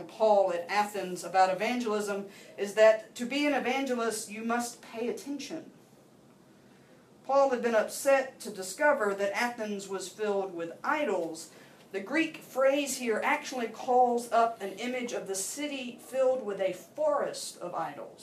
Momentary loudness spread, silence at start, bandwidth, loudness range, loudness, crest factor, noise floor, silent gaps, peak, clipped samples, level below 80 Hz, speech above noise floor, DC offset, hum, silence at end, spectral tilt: 12 LU; 0 s; 15.5 kHz; 5 LU; -30 LUFS; 20 dB; -58 dBFS; none; -10 dBFS; under 0.1%; -82 dBFS; 28 dB; under 0.1%; none; 0 s; -3 dB/octave